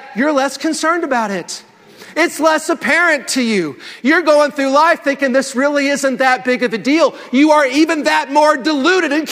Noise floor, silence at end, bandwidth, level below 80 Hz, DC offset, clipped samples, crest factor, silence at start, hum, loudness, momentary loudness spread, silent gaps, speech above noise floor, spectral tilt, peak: -37 dBFS; 0 s; 16 kHz; -64 dBFS; under 0.1%; under 0.1%; 14 dB; 0 s; none; -14 LUFS; 6 LU; none; 23 dB; -3 dB/octave; 0 dBFS